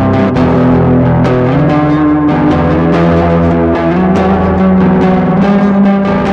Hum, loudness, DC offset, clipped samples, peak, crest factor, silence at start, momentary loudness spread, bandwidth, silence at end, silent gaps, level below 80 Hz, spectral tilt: none; -9 LUFS; under 0.1%; under 0.1%; 0 dBFS; 8 dB; 0 s; 2 LU; 6.8 kHz; 0 s; none; -26 dBFS; -9.5 dB/octave